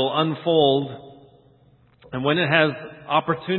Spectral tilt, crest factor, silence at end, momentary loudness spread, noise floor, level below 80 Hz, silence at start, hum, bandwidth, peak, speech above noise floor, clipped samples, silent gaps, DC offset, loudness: -10.5 dB/octave; 22 dB; 0 s; 16 LU; -56 dBFS; -60 dBFS; 0 s; none; 4.3 kHz; -2 dBFS; 35 dB; under 0.1%; none; under 0.1%; -21 LUFS